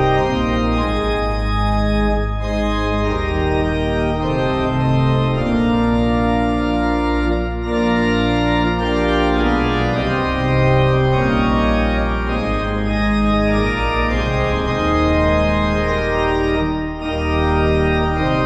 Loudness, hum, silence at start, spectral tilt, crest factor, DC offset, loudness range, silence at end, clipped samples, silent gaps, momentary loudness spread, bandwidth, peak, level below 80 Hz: -18 LUFS; none; 0 s; -7.5 dB/octave; 14 dB; under 0.1%; 2 LU; 0 s; under 0.1%; none; 4 LU; 10 kHz; -2 dBFS; -24 dBFS